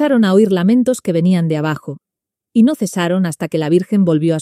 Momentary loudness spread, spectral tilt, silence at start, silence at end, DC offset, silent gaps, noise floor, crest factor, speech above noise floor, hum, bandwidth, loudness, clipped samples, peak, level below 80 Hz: 8 LU; -7 dB/octave; 0 s; 0 s; under 0.1%; none; -83 dBFS; 14 dB; 69 dB; none; 14 kHz; -15 LUFS; under 0.1%; 0 dBFS; -60 dBFS